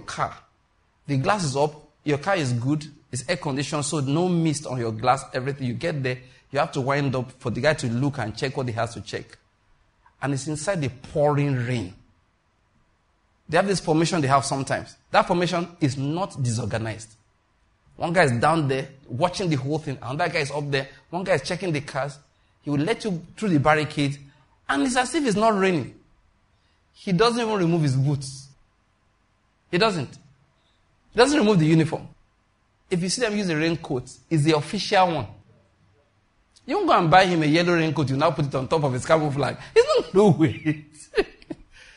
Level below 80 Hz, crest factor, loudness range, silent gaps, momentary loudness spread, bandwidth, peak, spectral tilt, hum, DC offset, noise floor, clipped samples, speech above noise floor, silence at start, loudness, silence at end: -54 dBFS; 20 dB; 6 LU; none; 12 LU; 11 kHz; -4 dBFS; -5.5 dB/octave; none; under 0.1%; -66 dBFS; under 0.1%; 43 dB; 0 s; -23 LUFS; 0.45 s